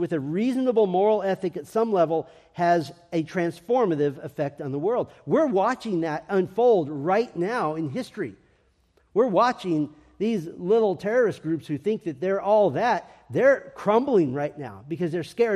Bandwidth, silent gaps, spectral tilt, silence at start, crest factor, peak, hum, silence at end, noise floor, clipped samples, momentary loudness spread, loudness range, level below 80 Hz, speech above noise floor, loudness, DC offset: 13 kHz; none; -7 dB/octave; 0 s; 16 dB; -8 dBFS; none; 0 s; -64 dBFS; under 0.1%; 10 LU; 3 LU; -66 dBFS; 40 dB; -24 LUFS; under 0.1%